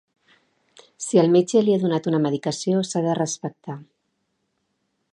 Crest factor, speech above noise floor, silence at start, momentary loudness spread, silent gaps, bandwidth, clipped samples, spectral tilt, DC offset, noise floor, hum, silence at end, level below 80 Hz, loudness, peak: 20 dB; 53 dB; 1 s; 16 LU; none; 11 kHz; under 0.1%; -6 dB/octave; under 0.1%; -73 dBFS; none; 1.3 s; -72 dBFS; -21 LUFS; -4 dBFS